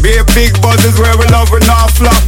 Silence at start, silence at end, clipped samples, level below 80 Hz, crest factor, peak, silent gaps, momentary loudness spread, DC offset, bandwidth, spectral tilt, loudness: 0 s; 0 s; 0.8%; -10 dBFS; 6 dB; 0 dBFS; none; 1 LU; 2%; 18.5 kHz; -4.5 dB/octave; -8 LUFS